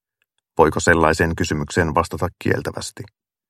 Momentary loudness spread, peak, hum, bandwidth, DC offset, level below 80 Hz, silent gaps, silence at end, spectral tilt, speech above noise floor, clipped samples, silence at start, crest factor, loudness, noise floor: 15 LU; 0 dBFS; none; 15 kHz; under 0.1%; -38 dBFS; none; 0.45 s; -5 dB/octave; 54 dB; under 0.1%; 0.55 s; 20 dB; -19 LUFS; -73 dBFS